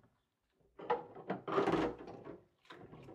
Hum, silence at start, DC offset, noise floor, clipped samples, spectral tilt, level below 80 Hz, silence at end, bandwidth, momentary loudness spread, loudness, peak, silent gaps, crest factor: none; 0.8 s; under 0.1%; -81 dBFS; under 0.1%; -6.5 dB/octave; -66 dBFS; 0 s; 11 kHz; 22 LU; -38 LUFS; -20 dBFS; none; 22 dB